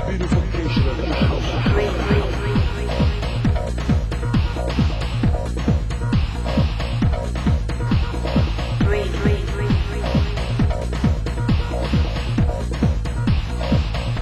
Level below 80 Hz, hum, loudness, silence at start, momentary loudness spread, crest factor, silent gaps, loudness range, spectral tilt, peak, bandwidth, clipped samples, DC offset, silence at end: -22 dBFS; none; -21 LUFS; 0 s; 2 LU; 14 dB; none; 1 LU; -7 dB/octave; -4 dBFS; 12 kHz; under 0.1%; under 0.1%; 0 s